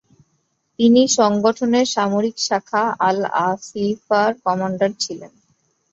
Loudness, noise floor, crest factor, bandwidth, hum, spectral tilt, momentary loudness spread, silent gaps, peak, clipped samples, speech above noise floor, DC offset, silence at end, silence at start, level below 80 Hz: -18 LUFS; -68 dBFS; 16 dB; 7.8 kHz; none; -4 dB/octave; 9 LU; none; -2 dBFS; under 0.1%; 50 dB; under 0.1%; 0.65 s; 0.8 s; -62 dBFS